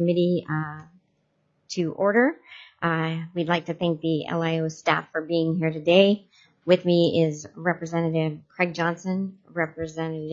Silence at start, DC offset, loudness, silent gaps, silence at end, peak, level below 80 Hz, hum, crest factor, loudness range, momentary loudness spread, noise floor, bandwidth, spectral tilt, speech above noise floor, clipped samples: 0 s; under 0.1%; -24 LUFS; none; 0 s; -4 dBFS; -68 dBFS; none; 20 dB; 4 LU; 10 LU; -70 dBFS; 7.6 kHz; -6.5 dB/octave; 46 dB; under 0.1%